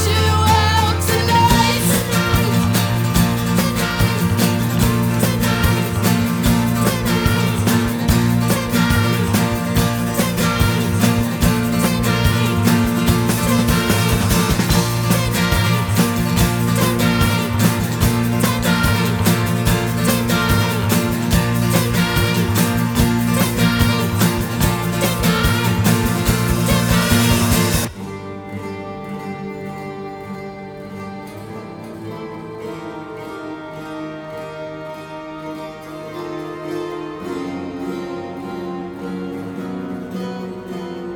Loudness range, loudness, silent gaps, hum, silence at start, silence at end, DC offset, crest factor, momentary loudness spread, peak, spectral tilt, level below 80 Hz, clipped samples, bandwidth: 14 LU; -17 LUFS; none; none; 0 s; 0 s; under 0.1%; 16 dB; 15 LU; -2 dBFS; -5 dB/octave; -30 dBFS; under 0.1%; over 20 kHz